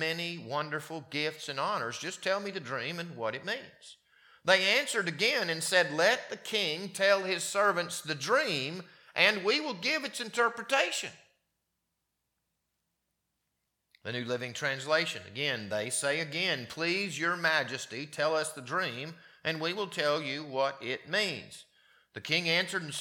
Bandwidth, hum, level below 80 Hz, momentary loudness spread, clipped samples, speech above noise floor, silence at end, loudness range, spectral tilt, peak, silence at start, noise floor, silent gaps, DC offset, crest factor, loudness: 19 kHz; none; -82 dBFS; 11 LU; under 0.1%; 51 dB; 0 s; 7 LU; -2.5 dB/octave; -6 dBFS; 0 s; -83 dBFS; none; under 0.1%; 26 dB; -30 LUFS